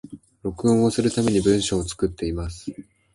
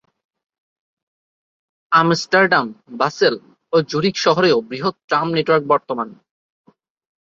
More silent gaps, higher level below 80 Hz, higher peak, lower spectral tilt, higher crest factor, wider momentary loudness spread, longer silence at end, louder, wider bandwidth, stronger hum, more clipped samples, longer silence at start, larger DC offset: second, none vs 5.04-5.08 s; first, -40 dBFS vs -64 dBFS; second, -6 dBFS vs -2 dBFS; about the same, -5.5 dB/octave vs -5 dB/octave; about the same, 16 dB vs 18 dB; first, 14 LU vs 11 LU; second, 0.35 s vs 1.1 s; second, -22 LUFS vs -17 LUFS; first, 11.5 kHz vs 7.8 kHz; neither; neither; second, 0.05 s vs 1.9 s; neither